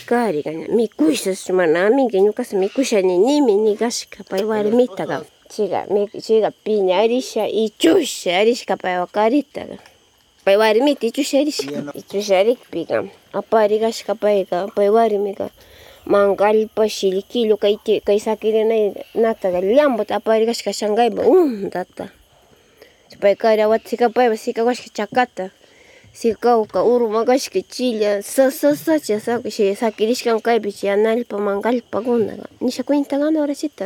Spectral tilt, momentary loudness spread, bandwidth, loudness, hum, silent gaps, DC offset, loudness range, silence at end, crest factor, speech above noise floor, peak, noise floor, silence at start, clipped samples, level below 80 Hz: -4.5 dB/octave; 9 LU; 17.5 kHz; -18 LUFS; none; none; under 0.1%; 2 LU; 0 s; 16 dB; 37 dB; -2 dBFS; -55 dBFS; 0 s; under 0.1%; -62 dBFS